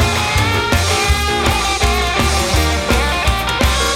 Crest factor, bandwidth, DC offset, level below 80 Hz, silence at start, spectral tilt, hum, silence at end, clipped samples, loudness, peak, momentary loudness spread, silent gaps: 14 dB; 17 kHz; under 0.1%; -20 dBFS; 0 s; -3.5 dB/octave; none; 0 s; under 0.1%; -15 LUFS; 0 dBFS; 1 LU; none